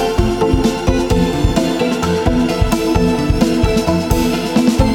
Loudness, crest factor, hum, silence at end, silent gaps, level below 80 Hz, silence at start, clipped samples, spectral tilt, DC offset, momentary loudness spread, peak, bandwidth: -15 LUFS; 14 dB; none; 0 s; none; -22 dBFS; 0 s; under 0.1%; -6 dB/octave; under 0.1%; 2 LU; 0 dBFS; 18 kHz